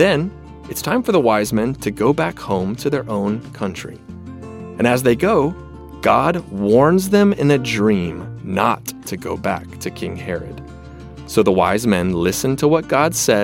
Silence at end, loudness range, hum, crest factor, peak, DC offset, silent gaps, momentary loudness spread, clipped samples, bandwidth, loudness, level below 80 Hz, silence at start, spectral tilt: 0 s; 6 LU; none; 16 dB; -2 dBFS; under 0.1%; none; 19 LU; under 0.1%; 16.5 kHz; -18 LUFS; -44 dBFS; 0 s; -5.5 dB/octave